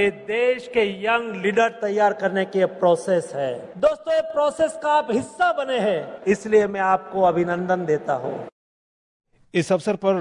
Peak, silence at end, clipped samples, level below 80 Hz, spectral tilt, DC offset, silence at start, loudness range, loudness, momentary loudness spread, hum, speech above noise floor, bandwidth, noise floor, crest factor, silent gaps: -6 dBFS; 0 s; under 0.1%; -60 dBFS; -5.5 dB/octave; under 0.1%; 0 s; 2 LU; -22 LUFS; 6 LU; none; over 69 dB; 11 kHz; under -90 dBFS; 16 dB; 8.52-9.20 s